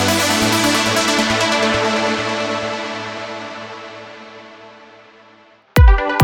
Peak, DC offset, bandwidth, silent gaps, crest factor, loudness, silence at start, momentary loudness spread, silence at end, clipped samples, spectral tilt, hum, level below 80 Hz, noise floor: 0 dBFS; under 0.1%; 19.5 kHz; none; 18 dB; -16 LUFS; 0 s; 20 LU; 0 s; under 0.1%; -4 dB/octave; none; -22 dBFS; -48 dBFS